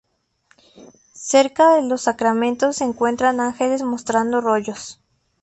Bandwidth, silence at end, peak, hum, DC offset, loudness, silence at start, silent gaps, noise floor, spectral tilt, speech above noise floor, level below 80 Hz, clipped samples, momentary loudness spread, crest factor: 8.6 kHz; 0.5 s; -2 dBFS; none; under 0.1%; -18 LUFS; 0.8 s; none; -61 dBFS; -3.5 dB/octave; 43 dB; -60 dBFS; under 0.1%; 9 LU; 18 dB